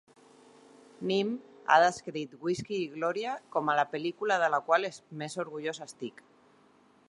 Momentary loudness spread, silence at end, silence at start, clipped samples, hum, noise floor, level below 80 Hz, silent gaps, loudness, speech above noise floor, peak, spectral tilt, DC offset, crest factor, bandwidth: 14 LU; 1 s; 1 s; under 0.1%; none; -63 dBFS; -76 dBFS; none; -30 LUFS; 33 dB; -8 dBFS; -4.5 dB/octave; under 0.1%; 24 dB; 11.5 kHz